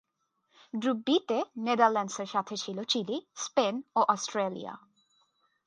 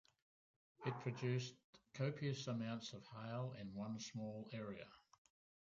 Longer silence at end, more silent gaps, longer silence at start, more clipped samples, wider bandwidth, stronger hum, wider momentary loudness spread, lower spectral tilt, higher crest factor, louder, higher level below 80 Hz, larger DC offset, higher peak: first, 0.9 s vs 0.7 s; second, none vs 1.64-1.73 s; about the same, 0.75 s vs 0.8 s; neither; first, 10.5 kHz vs 7.6 kHz; neither; about the same, 11 LU vs 10 LU; second, -3.5 dB/octave vs -6 dB/octave; about the same, 22 dB vs 20 dB; first, -30 LUFS vs -47 LUFS; about the same, -84 dBFS vs -80 dBFS; neither; first, -10 dBFS vs -28 dBFS